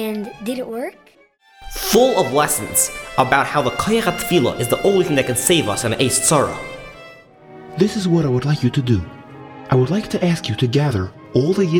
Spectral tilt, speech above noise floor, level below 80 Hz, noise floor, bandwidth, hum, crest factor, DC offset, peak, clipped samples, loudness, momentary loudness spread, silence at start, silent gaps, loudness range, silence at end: -4.5 dB/octave; 33 dB; -44 dBFS; -51 dBFS; over 20 kHz; none; 18 dB; under 0.1%; 0 dBFS; under 0.1%; -18 LUFS; 14 LU; 0 s; none; 3 LU; 0 s